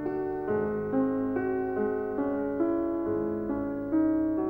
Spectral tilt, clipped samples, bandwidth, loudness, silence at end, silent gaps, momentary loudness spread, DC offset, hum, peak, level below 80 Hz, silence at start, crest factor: -11 dB/octave; under 0.1%; 3.1 kHz; -29 LUFS; 0 s; none; 5 LU; 0.1%; none; -16 dBFS; -54 dBFS; 0 s; 12 dB